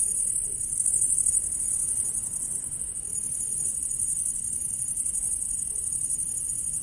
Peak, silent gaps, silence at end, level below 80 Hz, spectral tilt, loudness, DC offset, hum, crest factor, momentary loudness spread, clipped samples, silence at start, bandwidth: -8 dBFS; none; 0 s; -50 dBFS; -1 dB/octave; -25 LUFS; under 0.1%; none; 20 dB; 7 LU; under 0.1%; 0 s; 11.5 kHz